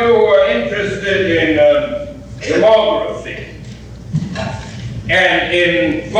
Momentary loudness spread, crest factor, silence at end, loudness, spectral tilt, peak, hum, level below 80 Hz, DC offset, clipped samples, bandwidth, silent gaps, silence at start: 17 LU; 12 dB; 0 s; -14 LUFS; -5.5 dB/octave; -2 dBFS; none; -38 dBFS; under 0.1%; under 0.1%; 9.6 kHz; none; 0 s